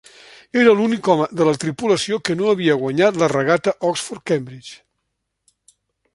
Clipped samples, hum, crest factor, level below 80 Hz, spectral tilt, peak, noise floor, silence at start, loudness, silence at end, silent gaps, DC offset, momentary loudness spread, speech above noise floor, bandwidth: under 0.1%; none; 18 dB; -62 dBFS; -5 dB/octave; -2 dBFS; -75 dBFS; 0.55 s; -18 LUFS; 1.4 s; none; under 0.1%; 9 LU; 57 dB; 11.5 kHz